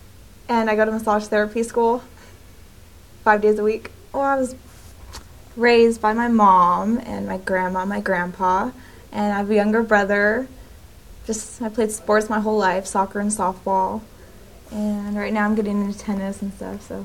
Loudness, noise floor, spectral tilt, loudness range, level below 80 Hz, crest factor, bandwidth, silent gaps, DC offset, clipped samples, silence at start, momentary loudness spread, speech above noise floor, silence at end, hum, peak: -20 LUFS; -46 dBFS; -5 dB/octave; 5 LU; -48 dBFS; 18 dB; 17 kHz; none; 0.3%; under 0.1%; 0.5 s; 14 LU; 26 dB; 0 s; none; -2 dBFS